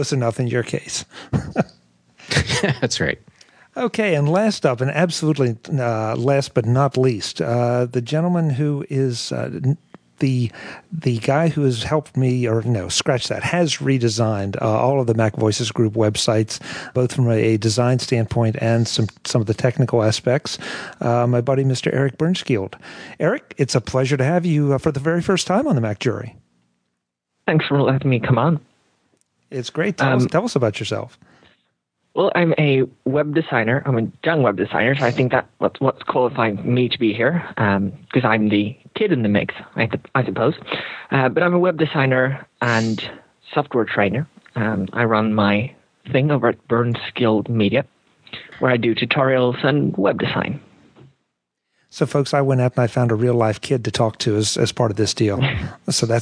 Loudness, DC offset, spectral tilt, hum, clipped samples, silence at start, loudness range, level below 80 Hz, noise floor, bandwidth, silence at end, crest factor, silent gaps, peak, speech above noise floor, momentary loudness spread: -19 LUFS; under 0.1%; -5.5 dB/octave; none; under 0.1%; 0 s; 3 LU; -52 dBFS; -76 dBFS; 11 kHz; 0 s; 18 dB; none; -2 dBFS; 57 dB; 8 LU